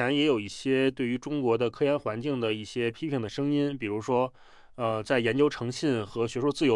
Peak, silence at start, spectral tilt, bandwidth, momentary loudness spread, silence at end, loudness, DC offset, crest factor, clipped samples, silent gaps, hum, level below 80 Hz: -10 dBFS; 0 s; -6 dB/octave; 11.5 kHz; 6 LU; 0 s; -28 LUFS; under 0.1%; 18 dB; under 0.1%; none; none; -62 dBFS